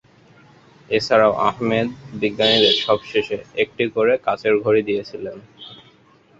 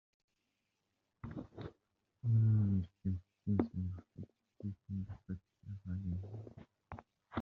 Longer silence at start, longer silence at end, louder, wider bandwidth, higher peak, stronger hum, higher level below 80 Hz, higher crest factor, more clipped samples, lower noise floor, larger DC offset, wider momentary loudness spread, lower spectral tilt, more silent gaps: second, 0.9 s vs 1.25 s; first, 0.65 s vs 0 s; first, -19 LUFS vs -39 LUFS; first, 7.8 kHz vs 4.1 kHz; first, -2 dBFS vs -16 dBFS; neither; first, -56 dBFS vs -66 dBFS; about the same, 18 dB vs 22 dB; neither; second, -53 dBFS vs -85 dBFS; neither; second, 17 LU vs 22 LU; second, -5 dB/octave vs -10.5 dB/octave; neither